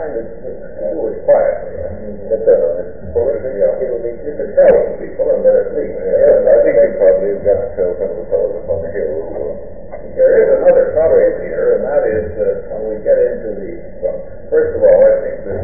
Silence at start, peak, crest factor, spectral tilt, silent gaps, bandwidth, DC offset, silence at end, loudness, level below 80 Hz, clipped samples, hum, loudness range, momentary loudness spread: 0 s; 0 dBFS; 14 dB; -12 dB/octave; none; 2.8 kHz; 4%; 0 s; -14 LUFS; -38 dBFS; under 0.1%; none; 5 LU; 15 LU